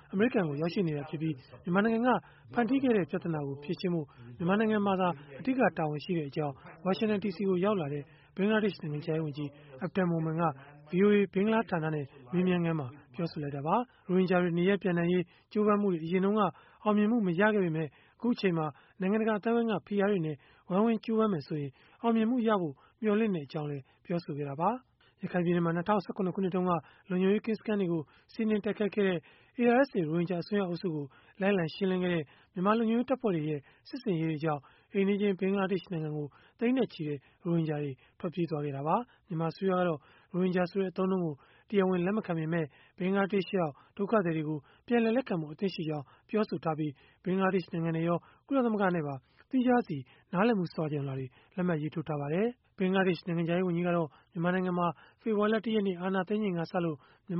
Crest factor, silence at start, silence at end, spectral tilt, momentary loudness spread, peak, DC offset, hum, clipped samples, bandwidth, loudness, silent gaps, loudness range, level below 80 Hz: 18 dB; 0.1 s; 0 s; -6.5 dB/octave; 10 LU; -12 dBFS; under 0.1%; none; under 0.1%; 5.8 kHz; -31 LUFS; none; 3 LU; -70 dBFS